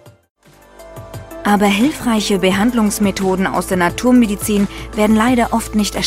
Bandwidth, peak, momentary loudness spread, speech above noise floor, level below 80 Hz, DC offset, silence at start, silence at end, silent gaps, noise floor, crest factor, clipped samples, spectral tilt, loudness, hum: 16 kHz; 0 dBFS; 8 LU; 28 dB; -36 dBFS; under 0.1%; 0.05 s; 0 s; 0.30-0.35 s; -42 dBFS; 14 dB; under 0.1%; -5 dB/octave; -15 LUFS; none